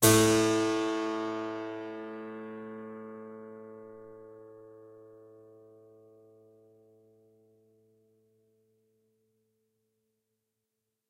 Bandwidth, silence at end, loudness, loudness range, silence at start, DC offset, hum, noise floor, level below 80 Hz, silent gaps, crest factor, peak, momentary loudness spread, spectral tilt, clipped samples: 16 kHz; 5.95 s; -30 LUFS; 26 LU; 0 s; under 0.1%; none; -85 dBFS; -64 dBFS; none; 26 dB; -8 dBFS; 27 LU; -4 dB/octave; under 0.1%